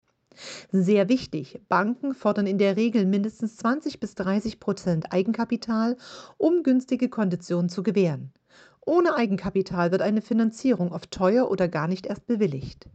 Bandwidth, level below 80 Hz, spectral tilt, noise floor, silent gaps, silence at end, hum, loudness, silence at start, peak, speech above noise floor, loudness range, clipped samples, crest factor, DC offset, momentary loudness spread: 8.4 kHz; -58 dBFS; -7 dB/octave; -45 dBFS; none; 0.05 s; none; -25 LUFS; 0.4 s; -8 dBFS; 21 dB; 2 LU; under 0.1%; 16 dB; under 0.1%; 9 LU